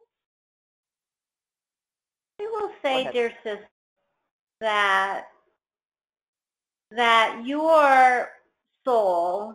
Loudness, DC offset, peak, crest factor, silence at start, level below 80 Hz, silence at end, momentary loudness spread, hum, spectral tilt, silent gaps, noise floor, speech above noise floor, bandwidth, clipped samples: -22 LUFS; under 0.1%; -4 dBFS; 20 dB; 2.4 s; -74 dBFS; 0 s; 18 LU; none; -2.5 dB/octave; 3.71-3.97 s, 4.31-4.47 s, 5.85-5.90 s, 6.28-6.33 s; under -90 dBFS; over 69 dB; 13.5 kHz; under 0.1%